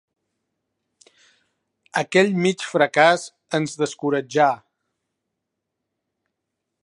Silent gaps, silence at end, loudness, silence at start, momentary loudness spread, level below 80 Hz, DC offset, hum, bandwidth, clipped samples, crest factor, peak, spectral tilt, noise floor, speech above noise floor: none; 2.3 s; -20 LUFS; 1.95 s; 10 LU; -74 dBFS; under 0.1%; none; 11.5 kHz; under 0.1%; 22 dB; -2 dBFS; -4.5 dB/octave; -80 dBFS; 61 dB